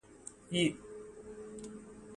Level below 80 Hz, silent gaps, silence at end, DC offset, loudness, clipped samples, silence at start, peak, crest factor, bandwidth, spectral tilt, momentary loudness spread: -66 dBFS; none; 0 s; under 0.1%; -37 LUFS; under 0.1%; 0.05 s; -18 dBFS; 22 dB; 11.5 kHz; -4.5 dB/octave; 18 LU